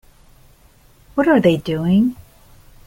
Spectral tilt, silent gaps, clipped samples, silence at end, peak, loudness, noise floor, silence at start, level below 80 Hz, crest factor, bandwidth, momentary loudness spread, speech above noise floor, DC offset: -8 dB/octave; none; under 0.1%; 0.75 s; -2 dBFS; -17 LUFS; -50 dBFS; 1.15 s; -48 dBFS; 18 dB; 16.5 kHz; 7 LU; 35 dB; under 0.1%